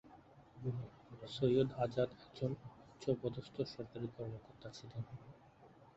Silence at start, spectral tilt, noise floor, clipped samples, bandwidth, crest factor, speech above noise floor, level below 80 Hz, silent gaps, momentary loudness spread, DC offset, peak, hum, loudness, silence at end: 0.05 s; -7 dB/octave; -63 dBFS; under 0.1%; 8 kHz; 20 dB; 23 dB; -68 dBFS; none; 19 LU; under 0.1%; -20 dBFS; none; -41 LUFS; 0.05 s